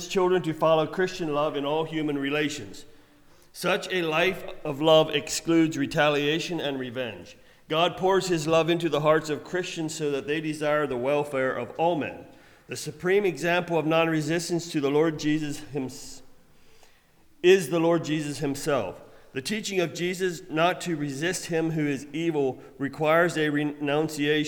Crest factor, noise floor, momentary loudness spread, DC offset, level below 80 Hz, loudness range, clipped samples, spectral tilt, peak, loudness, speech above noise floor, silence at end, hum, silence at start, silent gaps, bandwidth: 18 dB; -57 dBFS; 11 LU; under 0.1%; -58 dBFS; 4 LU; under 0.1%; -5 dB/octave; -8 dBFS; -26 LUFS; 32 dB; 0 s; none; 0 s; none; 19.5 kHz